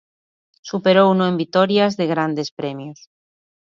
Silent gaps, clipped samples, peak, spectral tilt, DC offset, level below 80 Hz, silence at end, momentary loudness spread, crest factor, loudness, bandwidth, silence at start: 2.52-2.57 s; under 0.1%; -2 dBFS; -6.5 dB/octave; under 0.1%; -68 dBFS; 0.85 s; 17 LU; 18 dB; -18 LUFS; 7.4 kHz; 0.65 s